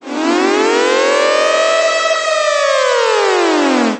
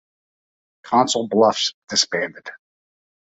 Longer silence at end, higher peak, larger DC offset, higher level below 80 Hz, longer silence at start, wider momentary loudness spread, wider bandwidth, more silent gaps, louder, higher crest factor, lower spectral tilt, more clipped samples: second, 0 s vs 0.75 s; about the same, 0 dBFS vs -2 dBFS; neither; about the same, -68 dBFS vs -68 dBFS; second, 0.05 s vs 0.85 s; second, 2 LU vs 14 LU; about the same, 9 kHz vs 8.4 kHz; second, none vs 1.74-1.82 s; first, -12 LUFS vs -19 LUFS; second, 12 dB vs 20 dB; about the same, -1.5 dB/octave vs -2.5 dB/octave; neither